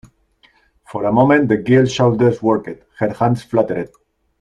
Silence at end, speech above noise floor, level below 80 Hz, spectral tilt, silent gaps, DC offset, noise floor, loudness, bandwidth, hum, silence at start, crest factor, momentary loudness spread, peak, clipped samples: 0.55 s; 41 dB; -50 dBFS; -7 dB/octave; none; under 0.1%; -56 dBFS; -16 LUFS; 10.5 kHz; none; 0.9 s; 16 dB; 12 LU; -2 dBFS; under 0.1%